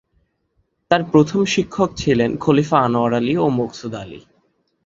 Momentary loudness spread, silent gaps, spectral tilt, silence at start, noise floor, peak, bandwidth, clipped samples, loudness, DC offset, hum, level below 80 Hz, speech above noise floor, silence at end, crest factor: 13 LU; none; -6 dB/octave; 0.9 s; -67 dBFS; -2 dBFS; 7.8 kHz; under 0.1%; -18 LUFS; under 0.1%; none; -48 dBFS; 49 dB; 0.65 s; 18 dB